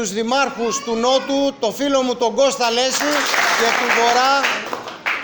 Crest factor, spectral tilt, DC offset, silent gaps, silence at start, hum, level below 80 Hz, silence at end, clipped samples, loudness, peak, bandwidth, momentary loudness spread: 14 dB; -1.5 dB/octave; under 0.1%; none; 0 s; none; -56 dBFS; 0 s; under 0.1%; -17 LUFS; -4 dBFS; over 20 kHz; 7 LU